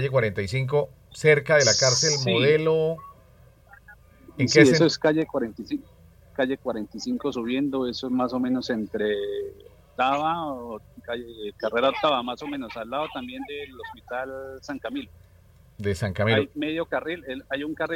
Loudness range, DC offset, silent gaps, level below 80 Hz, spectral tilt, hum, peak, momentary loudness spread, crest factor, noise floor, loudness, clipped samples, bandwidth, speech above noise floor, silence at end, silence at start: 8 LU; under 0.1%; none; -58 dBFS; -4 dB/octave; none; 0 dBFS; 17 LU; 24 dB; -54 dBFS; -24 LUFS; under 0.1%; 16 kHz; 29 dB; 0 s; 0 s